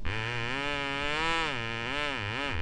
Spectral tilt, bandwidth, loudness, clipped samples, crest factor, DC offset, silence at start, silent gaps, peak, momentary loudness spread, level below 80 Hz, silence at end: -4 dB/octave; 10.5 kHz; -31 LUFS; under 0.1%; 18 dB; under 0.1%; 0 s; none; -14 dBFS; 4 LU; -44 dBFS; 0 s